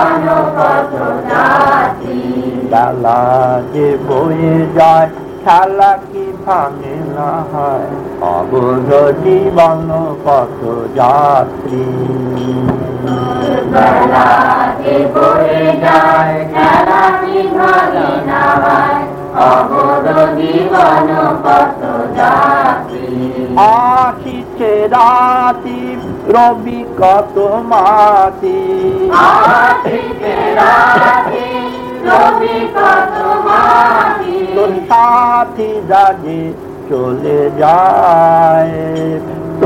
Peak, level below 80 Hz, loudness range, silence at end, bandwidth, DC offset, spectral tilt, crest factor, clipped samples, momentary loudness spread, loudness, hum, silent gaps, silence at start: 0 dBFS; -42 dBFS; 3 LU; 0 s; 16.5 kHz; under 0.1%; -7 dB/octave; 10 dB; 1%; 10 LU; -10 LUFS; none; none; 0 s